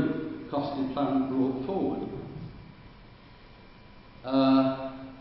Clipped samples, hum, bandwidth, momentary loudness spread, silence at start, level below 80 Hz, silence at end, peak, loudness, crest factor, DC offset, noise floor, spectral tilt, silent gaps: under 0.1%; none; 5.8 kHz; 20 LU; 0 s; -56 dBFS; 0 s; -10 dBFS; -28 LUFS; 20 dB; under 0.1%; -51 dBFS; -11 dB/octave; none